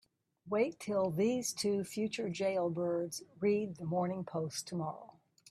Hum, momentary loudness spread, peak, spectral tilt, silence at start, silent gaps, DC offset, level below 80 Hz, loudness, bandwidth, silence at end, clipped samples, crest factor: none; 6 LU; -20 dBFS; -5 dB/octave; 0.45 s; none; under 0.1%; -76 dBFS; -36 LUFS; 15.5 kHz; 0.45 s; under 0.1%; 16 dB